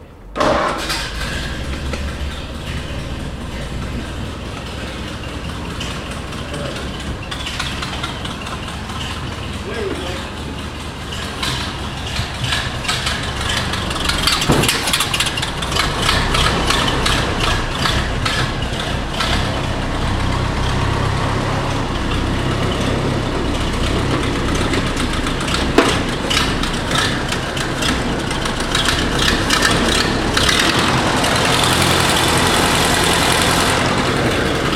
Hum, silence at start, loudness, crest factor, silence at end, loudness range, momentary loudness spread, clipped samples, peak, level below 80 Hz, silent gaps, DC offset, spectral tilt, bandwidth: none; 0 s; -18 LUFS; 18 dB; 0 s; 11 LU; 13 LU; under 0.1%; 0 dBFS; -26 dBFS; none; under 0.1%; -3.5 dB/octave; 16.5 kHz